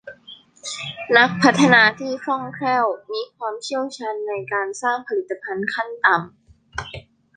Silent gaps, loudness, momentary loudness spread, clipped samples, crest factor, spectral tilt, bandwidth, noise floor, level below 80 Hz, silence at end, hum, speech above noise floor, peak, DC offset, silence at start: none; -20 LUFS; 19 LU; under 0.1%; 20 dB; -4 dB/octave; 9.8 kHz; -46 dBFS; -56 dBFS; 0.35 s; none; 26 dB; -2 dBFS; under 0.1%; 0.05 s